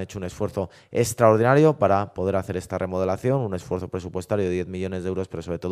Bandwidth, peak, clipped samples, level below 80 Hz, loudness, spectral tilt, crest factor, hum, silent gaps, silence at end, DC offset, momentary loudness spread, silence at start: 15.5 kHz; -2 dBFS; under 0.1%; -52 dBFS; -24 LUFS; -6.5 dB/octave; 22 dB; none; none; 0 s; under 0.1%; 13 LU; 0 s